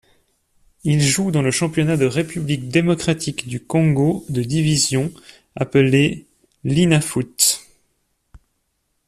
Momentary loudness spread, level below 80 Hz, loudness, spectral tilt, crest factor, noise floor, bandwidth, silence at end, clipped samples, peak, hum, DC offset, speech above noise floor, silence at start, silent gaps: 11 LU; -50 dBFS; -18 LUFS; -4.5 dB/octave; 18 dB; -70 dBFS; 14 kHz; 0.7 s; under 0.1%; -2 dBFS; none; under 0.1%; 52 dB; 0.85 s; none